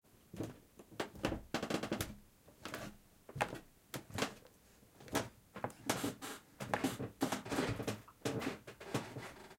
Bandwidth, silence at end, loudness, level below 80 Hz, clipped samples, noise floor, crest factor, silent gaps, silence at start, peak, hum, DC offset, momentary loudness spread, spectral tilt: 16.5 kHz; 0 s; -42 LUFS; -62 dBFS; under 0.1%; -65 dBFS; 26 dB; none; 0.35 s; -18 dBFS; none; under 0.1%; 14 LU; -4.5 dB/octave